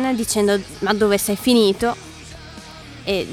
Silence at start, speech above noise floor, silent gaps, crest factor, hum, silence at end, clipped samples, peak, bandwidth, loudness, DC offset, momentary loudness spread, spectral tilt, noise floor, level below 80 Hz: 0 s; 19 dB; none; 18 dB; none; 0 s; under 0.1%; -2 dBFS; 20 kHz; -18 LUFS; under 0.1%; 21 LU; -4 dB/octave; -38 dBFS; -46 dBFS